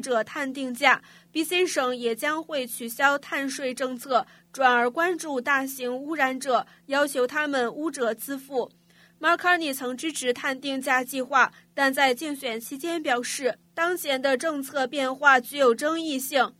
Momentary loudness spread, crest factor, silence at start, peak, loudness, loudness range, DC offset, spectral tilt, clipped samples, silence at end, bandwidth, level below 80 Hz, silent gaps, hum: 9 LU; 22 dB; 0 s; -2 dBFS; -25 LUFS; 3 LU; under 0.1%; -2 dB/octave; under 0.1%; 0.1 s; 16 kHz; -78 dBFS; none; none